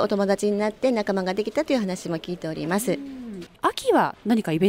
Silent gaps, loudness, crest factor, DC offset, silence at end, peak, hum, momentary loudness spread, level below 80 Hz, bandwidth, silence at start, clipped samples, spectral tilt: none; -24 LUFS; 16 dB; under 0.1%; 0 s; -8 dBFS; none; 9 LU; -58 dBFS; 16 kHz; 0 s; under 0.1%; -5.5 dB/octave